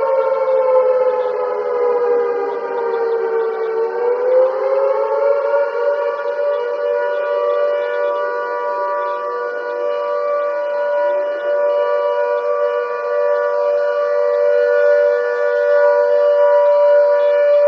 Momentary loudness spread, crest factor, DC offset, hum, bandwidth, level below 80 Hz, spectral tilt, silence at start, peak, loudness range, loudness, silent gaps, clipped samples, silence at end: 7 LU; 12 dB; under 0.1%; none; 6 kHz; -80 dBFS; -4 dB/octave; 0 s; -4 dBFS; 5 LU; -16 LUFS; none; under 0.1%; 0 s